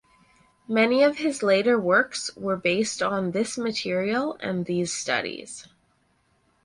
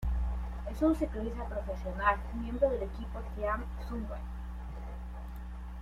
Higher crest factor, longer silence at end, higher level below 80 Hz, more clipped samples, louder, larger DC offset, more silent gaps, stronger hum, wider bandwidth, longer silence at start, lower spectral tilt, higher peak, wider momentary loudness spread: about the same, 20 dB vs 20 dB; first, 1.05 s vs 0 s; second, -66 dBFS vs -38 dBFS; neither; first, -24 LUFS vs -35 LUFS; neither; neither; neither; about the same, 11.5 kHz vs 11.5 kHz; first, 0.7 s vs 0 s; second, -4 dB/octave vs -8 dB/octave; first, -6 dBFS vs -14 dBFS; second, 9 LU vs 13 LU